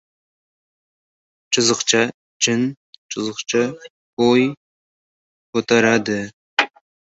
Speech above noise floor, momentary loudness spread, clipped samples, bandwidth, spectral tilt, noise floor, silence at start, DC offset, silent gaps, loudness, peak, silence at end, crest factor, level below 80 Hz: over 72 dB; 10 LU; under 0.1%; 8.2 kHz; -3 dB/octave; under -90 dBFS; 1.5 s; under 0.1%; 2.14-2.40 s, 2.77-3.09 s, 3.90-4.17 s, 4.57-5.53 s, 6.33-6.57 s; -19 LUFS; -2 dBFS; 0.5 s; 20 dB; -62 dBFS